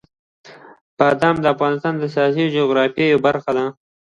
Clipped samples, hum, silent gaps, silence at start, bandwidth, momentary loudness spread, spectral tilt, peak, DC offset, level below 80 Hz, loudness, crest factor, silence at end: under 0.1%; none; 0.81-0.97 s; 0.45 s; 10.5 kHz; 6 LU; -7 dB/octave; 0 dBFS; under 0.1%; -58 dBFS; -18 LUFS; 18 dB; 0.3 s